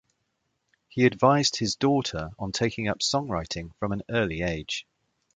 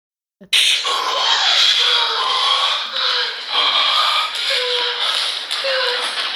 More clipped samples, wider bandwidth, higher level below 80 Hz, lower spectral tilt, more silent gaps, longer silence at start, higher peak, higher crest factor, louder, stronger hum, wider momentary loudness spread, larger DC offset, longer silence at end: neither; second, 9.6 kHz vs 17 kHz; first, -50 dBFS vs -74 dBFS; first, -4.5 dB/octave vs 2.5 dB/octave; neither; first, 0.95 s vs 0.4 s; second, -6 dBFS vs -2 dBFS; first, 22 dB vs 16 dB; second, -26 LUFS vs -15 LUFS; neither; first, 12 LU vs 7 LU; neither; first, 0.55 s vs 0 s